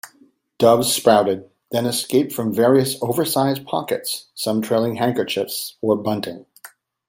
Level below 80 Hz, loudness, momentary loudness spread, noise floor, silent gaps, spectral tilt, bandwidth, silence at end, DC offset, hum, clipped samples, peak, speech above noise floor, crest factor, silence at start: -62 dBFS; -20 LUFS; 10 LU; -56 dBFS; none; -4.5 dB/octave; 16.5 kHz; 0.4 s; under 0.1%; none; under 0.1%; 0 dBFS; 37 dB; 20 dB; 0.05 s